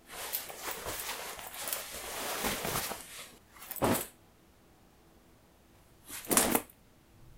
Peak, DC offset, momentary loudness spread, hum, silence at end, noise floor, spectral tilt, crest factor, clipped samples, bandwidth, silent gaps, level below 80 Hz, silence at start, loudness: -8 dBFS; under 0.1%; 17 LU; none; 0 s; -62 dBFS; -2.5 dB/octave; 30 dB; under 0.1%; 17 kHz; none; -58 dBFS; 0.05 s; -34 LUFS